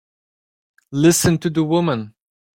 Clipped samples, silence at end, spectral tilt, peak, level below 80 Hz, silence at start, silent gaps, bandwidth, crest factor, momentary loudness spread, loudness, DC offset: under 0.1%; 0.5 s; -5 dB/octave; -2 dBFS; -50 dBFS; 0.9 s; none; 16.5 kHz; 18 dB; 13 LU; -18 LUFS; under 0.1%